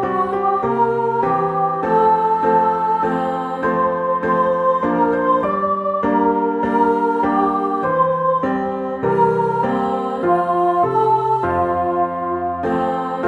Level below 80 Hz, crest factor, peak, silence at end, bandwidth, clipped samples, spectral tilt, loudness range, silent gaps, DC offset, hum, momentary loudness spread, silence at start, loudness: -50 dBFS; 14 dB; -4 dBFS; 0 s; 10.5 kHz; under 0.1%; -8.5 dB/octave; 1 LU; none; under 0.1%; none; 5 LU; 0 s; -18 LUFS